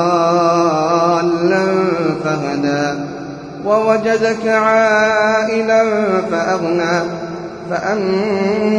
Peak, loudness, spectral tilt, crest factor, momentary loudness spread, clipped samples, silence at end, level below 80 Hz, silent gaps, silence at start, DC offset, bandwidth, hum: -2 dBFS; -15 LUFS; -5.5 dB/octave; 14 dB; 10 LU; under 0.1%; 0 s; -54 dBFS; none; 0 s; under 0.1%; 10.5 kHz; none